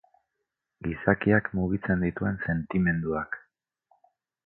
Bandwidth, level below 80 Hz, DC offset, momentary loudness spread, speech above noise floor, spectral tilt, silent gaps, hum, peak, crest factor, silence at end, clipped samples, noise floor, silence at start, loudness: 4.1 kHz; -48 dBFS; under 0.1%; 12 LU; 57 dB; -12 dB/octave; none; none; -6 dBFS; 24 dB; 1.05 s; under 0.1%; -83 dBFS; 0.8 s; -27 LUFS